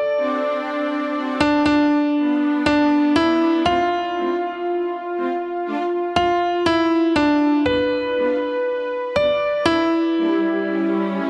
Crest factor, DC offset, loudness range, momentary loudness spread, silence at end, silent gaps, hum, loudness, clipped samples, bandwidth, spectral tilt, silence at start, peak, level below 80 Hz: 18 dB; under 0.1%; 3 LU; 7 LU; 0 s; none; none; -19 LUFS; under 0.1%; 9.6 kHz; -6 dB/octave; 0 s; -2 dBFS; -50 dBFS